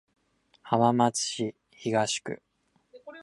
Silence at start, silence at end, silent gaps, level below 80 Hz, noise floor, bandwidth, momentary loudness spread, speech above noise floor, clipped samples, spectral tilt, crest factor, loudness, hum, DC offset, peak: 0.65 s; 0 s; none; -70 dBFS; -63 dBFS; 11.5 kHz; 17 LU; 36 dB; under 0.1%; -4 dB/octave; 22 dB; -27 LUFS; none; under 0.1%; -8 dBFS